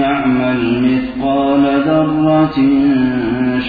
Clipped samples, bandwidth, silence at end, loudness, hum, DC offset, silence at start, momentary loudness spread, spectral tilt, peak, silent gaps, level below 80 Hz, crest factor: under 0.1%; 4.9 kHz; 0 s; -13 LUFS; none; under 0.1%; 0 s; 4 LU; -9.5 dB/octave; -2 dBFS; none; -40 dBFS; 12 dB